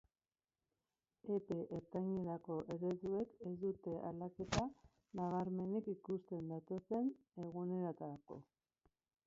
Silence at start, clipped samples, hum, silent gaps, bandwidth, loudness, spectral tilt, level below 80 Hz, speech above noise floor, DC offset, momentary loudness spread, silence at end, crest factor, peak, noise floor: 1.25 s; under 0.1%; none; none; 7.4 kHz; -44 LUFS; -7 dB/octave; -68 dBFS; over 47 dB; under 0.1%; 9 LU; 0.85 s; 24 dB; -22 dBFS; under -90 dBFS